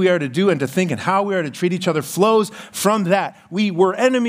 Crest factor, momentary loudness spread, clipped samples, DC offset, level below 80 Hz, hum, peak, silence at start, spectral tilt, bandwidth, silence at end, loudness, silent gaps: 16 dB; 6 LU; under 0.1%; under 0.1%; -68 dBFS; none; -2 dBFS; 0 s; -5.5 dB/octave; 16 kHz; 0 s; -19 LUFS; none